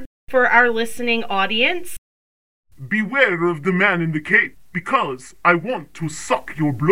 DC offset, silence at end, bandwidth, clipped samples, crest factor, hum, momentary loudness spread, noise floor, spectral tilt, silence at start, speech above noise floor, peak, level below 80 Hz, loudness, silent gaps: under 0.1%; 0 s; 16.5 kHz; under 0.1%; 20 dB; none; 13 LU; under -90 dBFS; -5 dB/octave; 0 s; over 71 dB; 0 dBFS; -54 dBFS; -19 LUFS; 0.06-0.27 s, 1.98-2.63 s